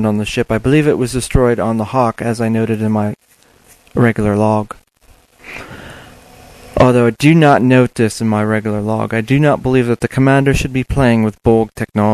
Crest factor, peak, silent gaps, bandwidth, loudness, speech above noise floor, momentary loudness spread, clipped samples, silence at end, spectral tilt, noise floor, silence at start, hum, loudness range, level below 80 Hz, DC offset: 14 dB; 0 dBFS; none; 13.5 kHz; -14 LUFS; 37 dB; 13 LU; under 0.1%; 0 s; -7 dB/octave; -49 dBFS; 0 s; none; 6 LU; -32 dBFS; under 0.1%